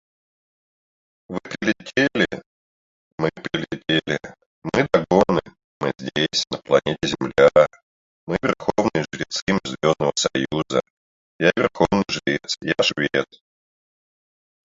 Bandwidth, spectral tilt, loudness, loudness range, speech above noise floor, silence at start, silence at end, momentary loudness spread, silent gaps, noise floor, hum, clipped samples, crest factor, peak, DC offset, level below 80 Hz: 7.8 kHz; -4.5 dB/octave; -21 LUFS; 4 LU; over 70 dB; 1.3 s; 1.4 s; 10 LU; 2.46-3.18 s, 4.46-4.62 s, 5.64-5.80 s, 7.83-8.27 s, 9.42-9.47 s, 10.90-11.39 s; under -90 dBFS; none; under 0.1%; 22 dB; 0 dBFS; under 0.1%; -52 dBFS